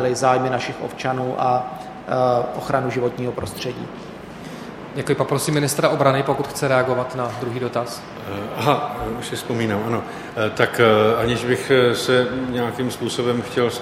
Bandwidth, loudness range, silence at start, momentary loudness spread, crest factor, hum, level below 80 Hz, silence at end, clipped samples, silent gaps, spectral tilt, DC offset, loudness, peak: 16.5 kHz; 5 LU; 0 s; 14 LU; 20 dB; none; -50 dBFS; 0 s; under 0.1%; none; -5 dB/octave; under 0.1%; -21 LUFS; 0 dBFS